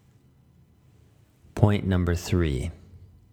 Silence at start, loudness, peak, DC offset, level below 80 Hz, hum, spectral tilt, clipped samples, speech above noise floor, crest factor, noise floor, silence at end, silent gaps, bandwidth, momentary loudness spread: 1.55 s; -25 LUFS; -2 dBFS; under 0.1%; -40 dBFS; none; -7 dB/octave; under 0.1%; 34 dB; 26 dB; -58 dBFS; 0.3 s; none; 16 kHz; 12 LU